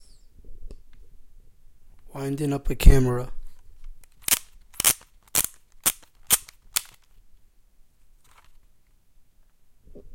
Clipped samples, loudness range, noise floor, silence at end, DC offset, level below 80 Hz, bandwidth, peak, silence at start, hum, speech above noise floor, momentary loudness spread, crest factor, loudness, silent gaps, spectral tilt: under 0.1%; 6 LU; -56 dBFS; 0.05 s; under 0.1%; -30 dBFS; 17 kHz; 0 dBFS; 0.45 s; none; 39 dB; 13 LU; 26 dB; -24 LUFS; none; -3.5 dB/octave